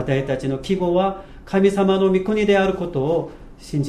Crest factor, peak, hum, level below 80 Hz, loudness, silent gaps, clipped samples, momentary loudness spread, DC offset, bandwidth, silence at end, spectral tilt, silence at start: 16 dB; -4 dBFS; none; -42 dBFS; -20 LUFS; none; under 0.1%; 7 LU; under 0.1%; 12 kHz; 0 s; -7 dB/octave; 0 s